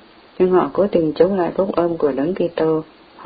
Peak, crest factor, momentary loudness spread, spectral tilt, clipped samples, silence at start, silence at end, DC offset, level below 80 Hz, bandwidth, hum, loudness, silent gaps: -2 dBFS; 16 dB; 4 LU; -12 dB/octave; under 0.1%; 0.4 s; 0 s; under 0.1%; -50 dBFS; 5 kHz; none; -18 LUFS; none